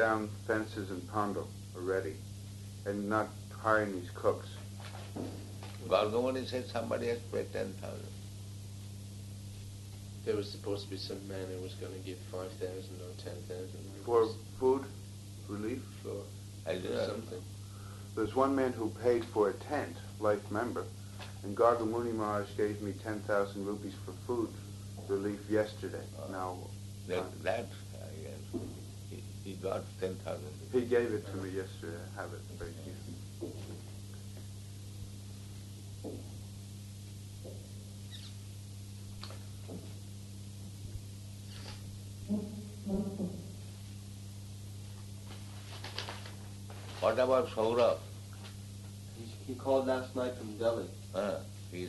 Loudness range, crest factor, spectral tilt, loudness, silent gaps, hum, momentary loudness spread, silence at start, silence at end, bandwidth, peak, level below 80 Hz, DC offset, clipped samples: 12 LU; 24 dB; -6 dB/octave; -38 LUFS; none; 50 Hz at -45 dBFS; 16 LU; 0 s; 0 s; 12 kHz; -12 dBFS; -60 dBFS; under 0.1%; under 0.1%